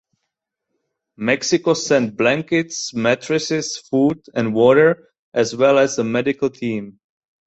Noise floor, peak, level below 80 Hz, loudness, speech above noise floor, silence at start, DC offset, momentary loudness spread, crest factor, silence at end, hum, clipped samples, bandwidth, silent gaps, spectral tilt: -79 dBFS; -2 dBFS; -60 dBFS; -18 LUFS; 61 dB; 1.2 s; under 0.1%; 10 LU; 18 dB; 0.55 s; none; under 0.1%; 8.2 kHz; 5.19-5.32 s; -4.5 dB/octave